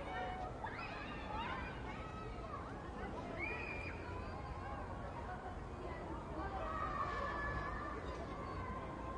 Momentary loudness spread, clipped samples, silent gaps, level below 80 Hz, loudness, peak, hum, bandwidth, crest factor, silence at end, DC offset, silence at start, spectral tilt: 6 LU; under 0.1%; none; -52 dBFS; -45 LUFS; -30 dBFS; none; 11 kHz; 14 dB; 0 s; under 0.1%; 0 s; -6.5 dB/octave